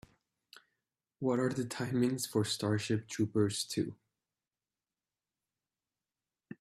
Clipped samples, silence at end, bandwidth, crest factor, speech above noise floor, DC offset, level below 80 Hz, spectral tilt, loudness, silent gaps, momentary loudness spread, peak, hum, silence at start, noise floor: under 0.1%; 0.05 s; 15.5 kHz; 20 dB; over 57 dB; under 0.1%; -72 dBFS; -5 dB/octave; -34 LUFS; none; 6 LU; -16 dBFS; none; 1.2 s; under -90 dBFS